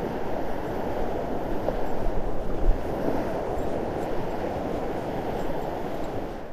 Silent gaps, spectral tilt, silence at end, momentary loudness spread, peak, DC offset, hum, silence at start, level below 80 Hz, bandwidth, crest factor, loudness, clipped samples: none; -7.5 dB/octave; 0 s; 3 LU; -8 dBFS; under 0.1%; none; 0 s; -32 dBFS; 15 kHz; 16 dB; -30 LUFS; under 0.1%